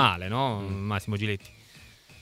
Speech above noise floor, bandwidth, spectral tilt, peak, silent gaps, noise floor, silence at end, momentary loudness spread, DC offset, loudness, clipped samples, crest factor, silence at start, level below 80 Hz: 24 dB; 15.5 kHz; -5.5 dB/octave; -6 dBFS; none; -52 dBFS; 0.05 s; 22 LU; under 0.1%; -29 LUFS; under 0.1%; 22 dB; 0 s; -58 dBFS